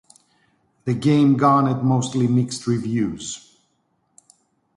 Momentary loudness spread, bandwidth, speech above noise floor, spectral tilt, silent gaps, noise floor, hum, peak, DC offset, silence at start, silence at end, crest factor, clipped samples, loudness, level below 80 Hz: 16 LU; 11.5 kHz; 49 dB; -6.5 dB/octave; none; -68 dBFS; none; -4 dBFS; under 0.1%; 0.85 s; 1.4 s; 18 dB; under 0.1%; -20 LUFS; -58 dBFS